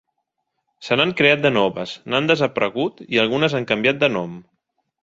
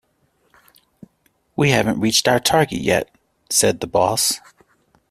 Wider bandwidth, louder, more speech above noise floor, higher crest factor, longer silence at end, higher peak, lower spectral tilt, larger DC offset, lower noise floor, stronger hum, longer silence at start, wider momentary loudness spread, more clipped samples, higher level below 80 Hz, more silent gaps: second, 7.8 kHz vs 15.5 kHz; about the same, -19 LUFS vs -18 LUFS; first, 56 dB vs 46 dB; about the same, 20 dB vs 20 dB; second, 0.6 s vs 0.75 s; about the same, 0 dBFS vs 0 dBFS; first, -5.5 dB/octave vs -3.5 dB/octave; neither; first, -75 dBFS vs -64 dBFS; neither; second, 0.8 s vs 1.6 s; first, 11 LU vs 6 LU; neither; second, -60 dBFS vs -50 dBFS; neither